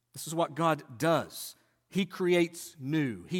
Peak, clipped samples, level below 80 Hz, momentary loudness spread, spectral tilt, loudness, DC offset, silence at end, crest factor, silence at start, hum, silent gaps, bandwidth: -14 dBFS; under 0.1%; -74 dBFS; 13 LU; -5.5 dB/octave; -31 LUFS; under 0.1%; 0 s; 18 dB; 0.15 s; none; none; 17.5 kHz